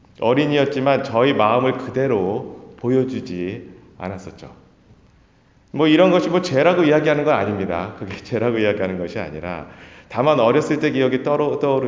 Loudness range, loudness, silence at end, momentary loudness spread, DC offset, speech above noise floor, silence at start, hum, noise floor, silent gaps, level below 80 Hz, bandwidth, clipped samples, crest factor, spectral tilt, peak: 7 LU; -19 LUFS; 0 s; 16 LU; under 0.1%; 36 dB; 0.2 s; none; -54 dBFS; none; -52 dBFS; 7.6 kHz; under 0.1%; 18 dB; -7 dB/octave; -2 dBFS